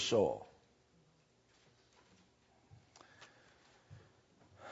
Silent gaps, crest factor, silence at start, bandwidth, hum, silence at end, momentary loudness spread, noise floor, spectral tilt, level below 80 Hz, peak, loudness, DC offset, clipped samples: none; 24 dB; 0 s; 7.6 kHz; 60 Hz at -80 dBFS; 0 s; 28 LU; -72 dBFS; -3.5 dB/octave; -78 dBFS; -20 dBFS; -36 LUFS; under 0.1%; under 0.1%